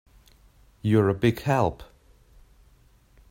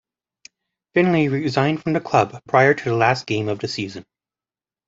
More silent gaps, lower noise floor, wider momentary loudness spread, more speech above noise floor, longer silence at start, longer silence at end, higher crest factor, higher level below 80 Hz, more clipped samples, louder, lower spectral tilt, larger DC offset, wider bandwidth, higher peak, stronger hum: neither; second, -58 dBFS vs under -90 dBFS; about the same, 10 LU vs 10 LU; second, 35 dB vs over 71 dB; about the same, 0.85 s vs 0.95 s; first, 1.45 s vs 0.85 s; about the same, 20 dB vs 20 dB; first, -52 dBFS vs -58 dBFS; neither; second, -24 LUFS vs -19 LUFS; about the same, -7.5 dB/octave vs -6.5 dB/octave; neither; first, 16 kHz vs 7.8 kHz; second, -8 dBFS vs -2 dBFS; neither